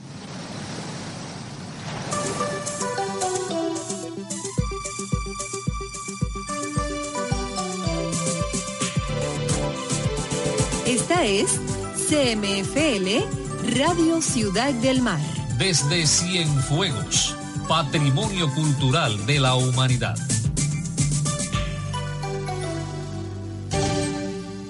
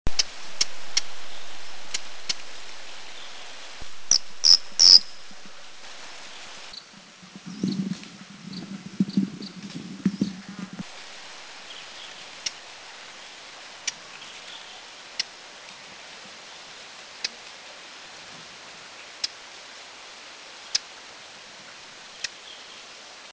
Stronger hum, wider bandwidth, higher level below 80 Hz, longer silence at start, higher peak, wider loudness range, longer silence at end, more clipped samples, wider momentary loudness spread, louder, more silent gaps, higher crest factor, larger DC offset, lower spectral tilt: neither; first, 11.5 kHz vs 8 kHz; first, -40 dBFS vs -52 dBFS; about the same, 0 s vs 0.05 s; second, -6 dBFS vs 0 dBFS; second, 7 LU vs 19 LU; about the same, 0 s vs 0 s; neither; second, 11 LU vs 19 LU; about the same, -24 LUFS vs -22 LUFS; neither; second, 18 dB vs 28 dB; neither; first, -4 dB/octave vs -1.5 dB/octave